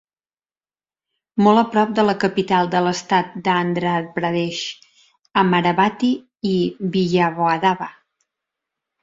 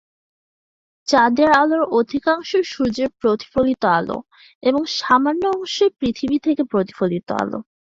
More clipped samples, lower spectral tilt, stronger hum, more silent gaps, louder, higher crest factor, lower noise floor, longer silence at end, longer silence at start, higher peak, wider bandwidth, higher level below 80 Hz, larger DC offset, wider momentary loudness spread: neither; about the same, -6 dB/octave vs -5 dB/octave; neither; second, none vs 4.55-4.61 s; about the same, -19 LUFS vs -19 LUFS; about the same, 18 dB vs 18 dB; about the same, under -90 dBFS vs under -90 dBFS; first, 1.1 s vs 0.3 s; first, 1.35 s vs 1.05 s; about the same, -2 dBFS vs -2 dBFS; about the same, 7.8 kHz vs 7.8 kHz; second, -60 dBFS vs -52 dBFS; neither; about the same, 8 LU vs 9 LU